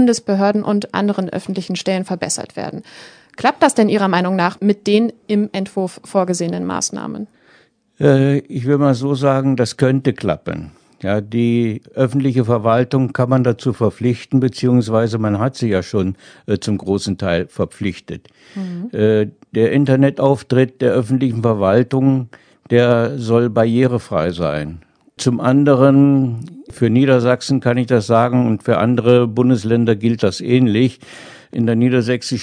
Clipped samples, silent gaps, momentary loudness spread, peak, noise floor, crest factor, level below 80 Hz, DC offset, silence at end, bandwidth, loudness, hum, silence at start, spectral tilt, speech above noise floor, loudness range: under 0.1%; none; 11 LU; 0 dBFS; -53 dBFS; 16 dB; -52 dBFS; under 0.1%; 0 s; 10 kHz; -16 LUFS; none; 0 s; -6.5 dB/octave; 37 dB; 5 LU